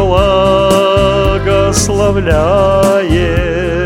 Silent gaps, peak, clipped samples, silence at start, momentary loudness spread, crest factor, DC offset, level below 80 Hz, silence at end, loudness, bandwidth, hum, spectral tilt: none; 0 dBFS; 0.2%; 0 s; 3 LU; 10 dB; under 0.1%; -20 dBFS; 0 s; -10 LUFS; 16.5 kHz; none; -5 dB/octave